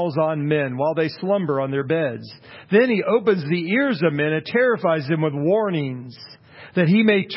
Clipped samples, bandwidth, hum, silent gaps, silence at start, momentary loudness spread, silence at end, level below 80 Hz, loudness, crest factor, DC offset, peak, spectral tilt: under 0.1%; 5.8 kHz; none; none; 0 s; 10 LU; 0 s; -66 dBFS; -20 LUFS; 16 dB; under 0.1%; -4 dBFS; -11.5 dB/octave